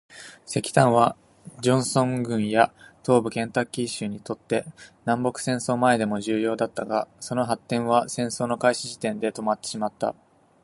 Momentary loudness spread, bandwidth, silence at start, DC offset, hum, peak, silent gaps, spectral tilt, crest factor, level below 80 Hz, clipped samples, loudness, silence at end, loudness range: 9 LU; 11.5 kHz; 0.1 s; under 0.1%; none; -2 dBFS; none; -5 dB/octave; 22 dB; -62 dBFS; under 0.1%; -25 LUFS; 0.5 s; 3 LU